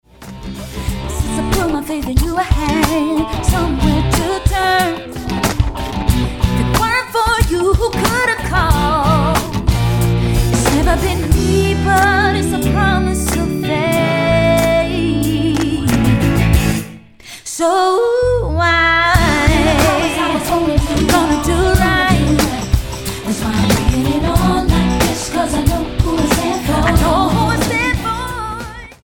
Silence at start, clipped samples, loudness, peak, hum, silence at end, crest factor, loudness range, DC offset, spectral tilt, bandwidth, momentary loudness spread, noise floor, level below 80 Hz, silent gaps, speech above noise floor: 0.2 s; under 0.1%; -15 LUFS; 0 dBFS; none; 0.1 s; 14 dB; 3 LU; under 0.1%; -5 dB/octave; 17.5 kHz; 8 LU; -36 dBFS; -22 dBFS; none; 23 dB